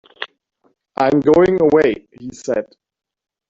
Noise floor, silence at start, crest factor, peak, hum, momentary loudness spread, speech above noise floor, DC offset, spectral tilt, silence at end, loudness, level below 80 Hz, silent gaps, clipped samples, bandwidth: -45 dBFS; 0.2 s; 16 dB; -2 dBFS; none; 20 LU; 30 dB; under 0.1%; -6.5 dB/octave; 0.85 s; -15 LUFS; -50 dBFS; none; under 0.1%; 7.8 kHz